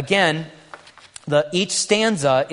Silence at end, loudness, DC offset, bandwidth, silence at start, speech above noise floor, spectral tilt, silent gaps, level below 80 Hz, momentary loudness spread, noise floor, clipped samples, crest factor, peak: 0 s; -19 LUFS; under 0.1%; 11 kHz; 0 s; 25 dB; -3.5 dB/octave; none; -62 dBFS; 13 LU; -44 dBFS; under 0.1%; 18 dB; -2 dBFS